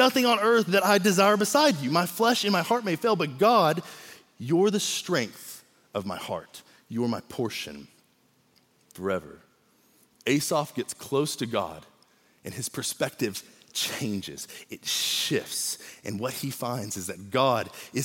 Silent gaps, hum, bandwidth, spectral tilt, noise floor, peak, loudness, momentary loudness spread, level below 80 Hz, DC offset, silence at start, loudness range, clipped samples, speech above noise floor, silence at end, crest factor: none; none; 17 kHz; -3.5 dB/octave; -65 dBFS; -8 dBFS; -26 LUFS; 17 LU; -72 dBFS; under 0.1%; 0 s; 12 LU; under 0.1%; 39 dB; 0 s; 20 dB